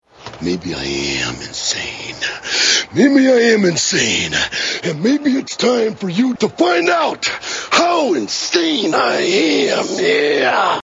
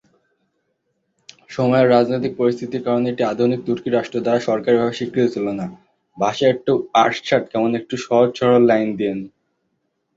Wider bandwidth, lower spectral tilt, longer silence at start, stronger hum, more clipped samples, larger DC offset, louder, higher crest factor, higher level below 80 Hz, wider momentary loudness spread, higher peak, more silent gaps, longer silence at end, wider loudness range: about the same, 8 kHz vs 7.8 kHz; second, -3 dB/octave vs -6.5 dB/octave; second, 0.2 s vs 1.5 s; neither; neither; neither; first, -15 LUFS vs -18 LUFS; about the same, 16 dB vs 16 dB; first, -50 dBFS vs -60 dBFS; about the same, 9 LU vs 10 LU; about the same, 0 dBFS vs -2 dBFS; neither; second, 0 s vs 0.9 s; about the same, 2 LU vs 3 LU